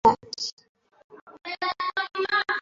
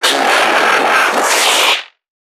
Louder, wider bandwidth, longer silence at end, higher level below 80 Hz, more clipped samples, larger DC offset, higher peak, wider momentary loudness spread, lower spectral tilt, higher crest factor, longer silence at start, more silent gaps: second, -27 LUFS vs -10 LUFS; second, 7.6 kHz vs 19.5 kHz; second, 0 s vs 0.4 s; first, -62 dBFS vs -80 dBFS; neither; neither; second, -6 dBFS vs 0 dBFS; first, 11 LU vs 2 LU; first, -2.5 dB/octave vs 0.5 dB/octave; first, 22 dB vs 12 dB; about the same, 0.05 s vs 0 s; first, 0.52-0.57 s, 0.69-0.75 s, 1.04-1.10 s, 1.21-1.27 s vs none